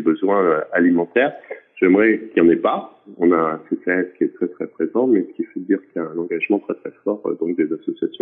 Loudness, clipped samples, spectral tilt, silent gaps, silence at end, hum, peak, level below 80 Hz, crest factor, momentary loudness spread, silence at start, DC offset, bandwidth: -19 LUFS; under 0.1%; -10.5 dB/octave; none; 0.05 s; none; -4 dBFS; -68 dBFS; 16 dB; 11 LU; 0 s; under 0.1%; 3.8 kHz